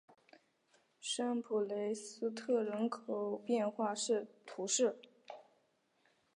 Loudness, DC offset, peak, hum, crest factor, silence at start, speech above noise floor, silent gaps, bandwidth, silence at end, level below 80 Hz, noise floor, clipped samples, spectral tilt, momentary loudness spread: -37 LUFS; under 0.1%; -22 dBFS; none; 18 dB; 1 s; 40 dB; none; 10.5 kHz; 0.95 s; under -90 dBFS; -77 dBFS; under 0.1%; -3 dB/octave; 18 LU